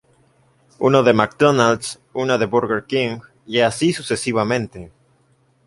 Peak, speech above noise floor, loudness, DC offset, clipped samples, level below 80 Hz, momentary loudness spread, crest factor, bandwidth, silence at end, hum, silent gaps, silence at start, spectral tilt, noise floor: 0 dBFS; 41 dB; -18 LUFS; under 0.1%; under 0.1%; -54 dBFS; 11 LU; 20 dB; 11.5 kHz; 0.8 s; none; none; 0.8 s; -5 dB/octave; -59 dBFS